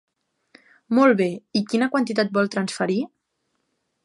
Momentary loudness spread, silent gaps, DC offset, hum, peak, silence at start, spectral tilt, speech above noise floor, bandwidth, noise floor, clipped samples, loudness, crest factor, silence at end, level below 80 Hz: 8 LU; none; under 0.1%; none; -6 dBFS; 0.9 s; -5.5 dB/octave; 53 dB; 11.5 kHz; -74 dBFS; under 0.1%; -22 LUFS; 18 dB; 1 s; -74 dBFS